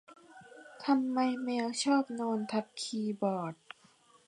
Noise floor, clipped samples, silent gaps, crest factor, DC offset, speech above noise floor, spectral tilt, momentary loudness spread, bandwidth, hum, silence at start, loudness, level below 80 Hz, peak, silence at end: -64 dBFS; under 0.1%; none; 18 dB; under 0.1%; 32 dB; -4.5 dB/octave; 22 LU; 11 kHz; none; 0.1 s; -33 LUFS; -86 dBFS; -16 dBFS; 0.75 s